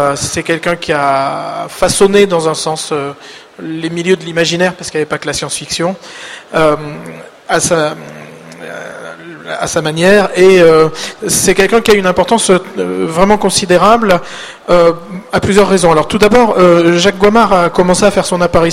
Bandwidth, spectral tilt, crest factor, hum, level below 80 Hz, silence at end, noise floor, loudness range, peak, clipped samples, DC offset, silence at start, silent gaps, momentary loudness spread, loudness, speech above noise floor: 16 kHz; -4 dB/octave; 10 dB; none; -36 dBFS; 0 s; -30 dBFS; 7 LU; 0 dBFS; 0.5%; under 0.1%; 0 s; none; 18 LU; -10 LUFS; 20 dB